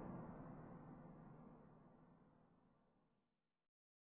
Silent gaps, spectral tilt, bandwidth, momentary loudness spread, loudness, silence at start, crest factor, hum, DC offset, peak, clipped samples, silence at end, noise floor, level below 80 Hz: none; -7 dB/octave; 3.1 kHz; 13 LU; -60 LUFS; 0 s; 20 dB; none; under 0.1%; -40 dBFS; under 0.1%; 0.95 s; -90 dBFS; -76 dBFS